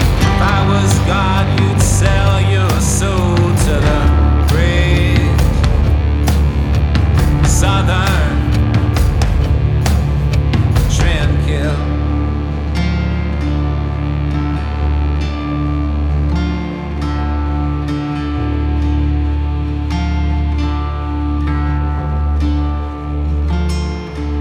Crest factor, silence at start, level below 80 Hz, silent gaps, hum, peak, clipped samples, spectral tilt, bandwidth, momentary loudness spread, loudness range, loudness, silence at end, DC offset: 14 dB; 0 s; -16 dBFS; none; none; 0 dBFS; under 0.1%; -6 dB/octave; 18 kHz; 6 LU; 5 LU; -15 LUFS; 0 s; under 0.1%